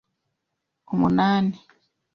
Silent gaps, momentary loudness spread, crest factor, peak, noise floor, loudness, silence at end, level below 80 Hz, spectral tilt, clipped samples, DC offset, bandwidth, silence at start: none; 11 LU; 18 dB; -8 dBFS; -80 dBFS; -22 LUFS; 0.55 s; -56 dBFS; -8 dB/octave; under 0.1%; under 0.1%; 6.2 kHz; 0.9 s